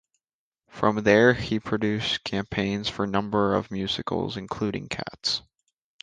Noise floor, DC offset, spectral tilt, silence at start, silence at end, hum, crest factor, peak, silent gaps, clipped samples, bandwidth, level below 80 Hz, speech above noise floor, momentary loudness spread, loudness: under -90 dBFS; under 0.1%; -5 dB/octave; 0.75 s; 0.6 s; none; 22 dB; -4 dBFS; none; under 0.1%; 9.6 kHz; -52 dBFS; over 65 dB; 10 LU; -25 LUFS